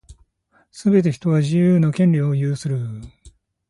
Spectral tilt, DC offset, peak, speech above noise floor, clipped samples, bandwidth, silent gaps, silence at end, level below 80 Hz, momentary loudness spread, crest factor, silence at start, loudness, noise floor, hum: -8.5 dB/octave; under 0.1%; -4 dBFS; 44 dB; under 0.1%; 11.5 kHz; none; 0.4 s; -52 dBFS; 10 LU; 14 dB; 0.1 s; -19 LUFS; -62 dBFS; none